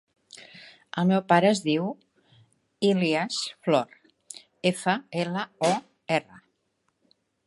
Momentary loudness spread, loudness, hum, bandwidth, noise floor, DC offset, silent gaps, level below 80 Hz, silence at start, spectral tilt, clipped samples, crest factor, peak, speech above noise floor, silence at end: 23 LU; -26 LUFS; none; 11.5 kHz; -74 dBFS; under 0.1%; none; -74 dBFS; 0.35 s; -5 dB/octave; under 0.1%; 22 dB; -4 dBFS; 50 dB; 1.1 s